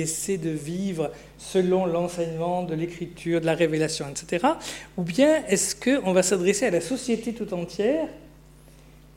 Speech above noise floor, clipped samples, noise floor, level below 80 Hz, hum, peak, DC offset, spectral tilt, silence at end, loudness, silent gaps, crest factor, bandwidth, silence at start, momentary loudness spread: 25 dB; under 0.1%; -50 dBFS; -54 dBFS; 60 Hz at -50 dBFS; -8 dBFS; under 0.1%; -4.5 dB/octave; 0.85 s; -25 LUFS; none; 18 dB; 16.5 kHz; 0 s; 10 LU